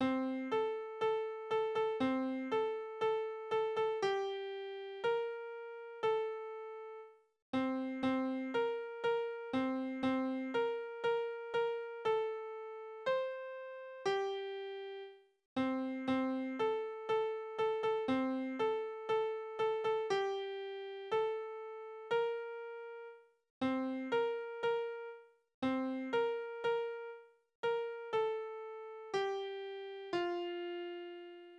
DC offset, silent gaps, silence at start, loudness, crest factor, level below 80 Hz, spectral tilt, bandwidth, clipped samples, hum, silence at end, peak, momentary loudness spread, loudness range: under 0.1%; 7.42-7.53 s, 15.45-15.56 s, 23.50-23.61 s, 25.54-25.62 s, 27.55-27.63 s; 0 s; -38 LUFS; 14 dB; -80 dBFS; -5.5 dB/octave; 8.4 kHz; under 0.1%; none; 0 s; -22 dBFS; 11 LU; 4 LU